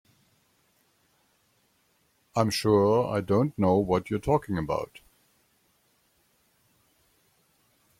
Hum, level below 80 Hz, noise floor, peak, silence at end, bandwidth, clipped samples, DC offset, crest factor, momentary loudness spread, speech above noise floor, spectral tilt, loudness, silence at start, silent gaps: none; -56 dBFS; -69 dBFS; -8 dBFS; 3.15 s; 16 kHz; under 0.1%; under 0.1%; 22 dB; 10 LU; 44 dB; -6.5 dB/octave; -26 LUFS; 2.35 s; none